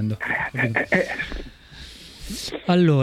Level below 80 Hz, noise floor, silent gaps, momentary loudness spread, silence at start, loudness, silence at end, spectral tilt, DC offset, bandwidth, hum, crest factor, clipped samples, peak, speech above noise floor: -42 dBFS; -42 dBFS; none; 21 LU; 0 s; -23 LUFS; 0 s; -6 dB/octave; under 0.1%; 15 kHz; none; 18 dB; under 0.1%; -4 dBFS; 21 dB